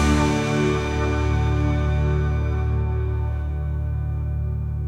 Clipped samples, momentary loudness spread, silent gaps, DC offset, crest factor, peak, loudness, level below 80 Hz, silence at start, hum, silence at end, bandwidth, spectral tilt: under 0.1%; 5 LU; none; under 0.1%; 14 dB; -8 dBFS; -23 LUFS; -26 dBFS; 0 s; none; 0 s; 10.5 kHz; -7 dB/octave